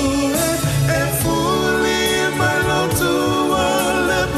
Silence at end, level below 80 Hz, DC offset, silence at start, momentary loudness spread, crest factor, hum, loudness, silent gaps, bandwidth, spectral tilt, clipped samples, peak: 0 s; -36 dBFS; under 0.1%; 0 s; 1 LU; 10 dB; none; -17 LUFS; none; 14 kHz; -4 dB/octave; under 0.1%; -6 dBFS